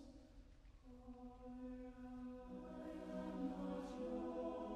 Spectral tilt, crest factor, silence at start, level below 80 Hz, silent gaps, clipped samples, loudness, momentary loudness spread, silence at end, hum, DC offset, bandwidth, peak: -7.5 dB/octave; 16 dB; 0 s; -64 dBFS; none; under 0.1%; -50 LUFS; 17 LU; 0 s; none; under 0.1%; 11.5 kHz; -34 dBFS